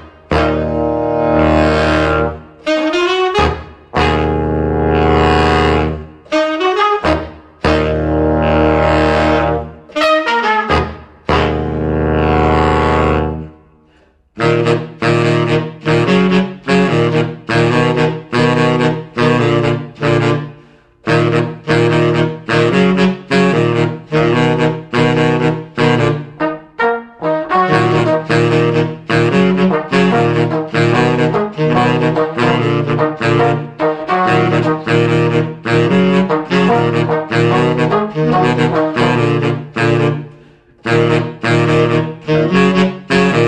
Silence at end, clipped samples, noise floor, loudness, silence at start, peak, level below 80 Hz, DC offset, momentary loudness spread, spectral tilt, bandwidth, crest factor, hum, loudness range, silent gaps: 0 s; under 0.1%; -51 dBFS; -14 LUFS; 0 s; 0 dBFS; -30 dBFS; under 0.1%; 6 LU; -7 dB/octave; 9.4 kHz; 14 dB; none; 2 LU; none